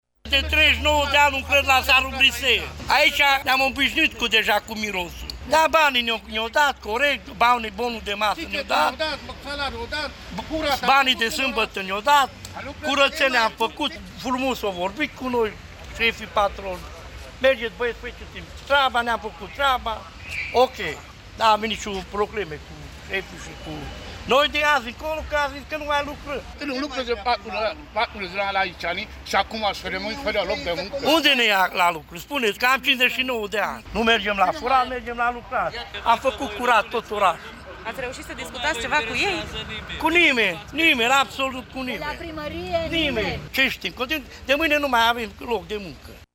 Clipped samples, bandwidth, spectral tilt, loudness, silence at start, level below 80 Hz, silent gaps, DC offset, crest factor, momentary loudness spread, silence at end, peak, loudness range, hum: under 0.1%; 17.5 kHz; -3 dB/octave; -21 LUFS; 0.25 s; -42 dBFS; none; under 0.1%; 18 dB; 15 LU; 0.1 s; -4 dBFS; 6 LU; none